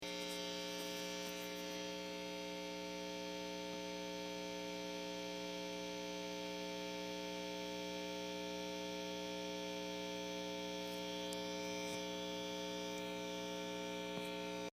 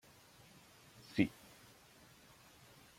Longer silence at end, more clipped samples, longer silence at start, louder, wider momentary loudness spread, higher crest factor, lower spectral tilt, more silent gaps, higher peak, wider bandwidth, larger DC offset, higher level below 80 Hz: second, 0 s vs 1.7 s; neither; second, 0 s vs 1.15 s; second, -44 LUFS vs -38 LUFS; second, 2 LU vs 24 LU; second, 18 dB vs 28 dB; second, -3.5 dB/octave vs -6 dB/octave; neither; second, -26 dBFS vs -18 dBFS; about the same, 15.5 kHz vs 16.5 kHz; neither; about the same, -72 dBFS vs -74 dBFS